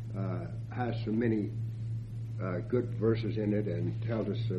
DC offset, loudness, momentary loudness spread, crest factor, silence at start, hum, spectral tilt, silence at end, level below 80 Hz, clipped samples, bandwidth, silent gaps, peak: under 0.1%; -33 LUFS; 8 LU; 16 dB; 0 s; none; -9.5 dB/octave; 0 s; -54 dBFS; under 0.1%; 5.6 kHz; none; -16 dBFS